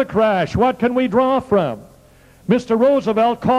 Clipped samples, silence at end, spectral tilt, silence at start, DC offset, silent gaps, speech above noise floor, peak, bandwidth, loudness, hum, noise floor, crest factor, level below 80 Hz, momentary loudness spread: under 0.1%; 0 s; -7.5 dB/octave; 0 s; under 0.1%; none; 32 dB; -2 dBFS; 13 kHz; -17 LUFS; none; -48 dBFS; 16 dB; -46 dBFS; 6 LU